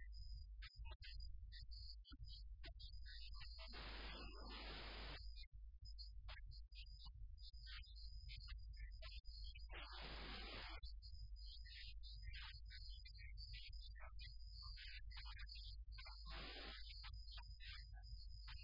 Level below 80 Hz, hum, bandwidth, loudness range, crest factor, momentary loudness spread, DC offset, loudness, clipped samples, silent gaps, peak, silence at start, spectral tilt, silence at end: -56 dBFS; none; 5.4 kHz; 3 LU; 14 dB; 6 LU; under 0.1%; -57 LUFS; under 0.1%; 0.95-1.00 s, 5.47-5.52 s; -42 dBFS; 0 s; -2.5 dB/octave; 0 s